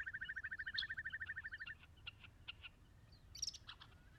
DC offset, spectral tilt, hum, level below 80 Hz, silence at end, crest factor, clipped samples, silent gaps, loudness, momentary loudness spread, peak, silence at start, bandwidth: under 0.1%; -0.5 dB/octave; none; -68 dBFS; 0 s; 22 dB; under 0.1%; none; -48 LUFS; 16 LU; -28 dBFS; 0 s; 14 kHz